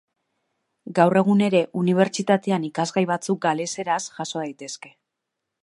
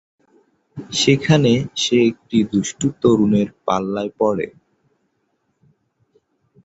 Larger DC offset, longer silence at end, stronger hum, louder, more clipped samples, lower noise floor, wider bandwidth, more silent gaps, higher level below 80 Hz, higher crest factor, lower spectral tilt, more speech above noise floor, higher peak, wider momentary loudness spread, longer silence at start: neither; second, 0.75 s vs 2.15 s; neither; second, -22 LUFS vs -18 LUFS; neither; first, -82 dBFS vs -69 dBFS; first, 11.5 kHz vs 8.2 kHz; neither; second, -72 dBFS vs -52 dBFS; about the same, 20 dB vs 20 dB; about the same, -5.5 dB/octave vs -5.5 dB/octave; first, 60 dB vs 51 dB; about the same, -2 dBFS vs 0 dBFS; about the same, 12 LU vs 10 LU; about the same, 0.85 s vs 0.75 s